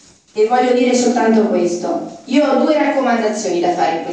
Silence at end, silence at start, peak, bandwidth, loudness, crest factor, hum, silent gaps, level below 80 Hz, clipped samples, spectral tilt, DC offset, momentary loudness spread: 0 s; 0.35 s; -2 dBFS; 9.6 kHz; -15 LUFS; 14 dB; none; none; -66 dBFS; under 0.1%; -4.5 dB/octave; under 0.1%; 6 LU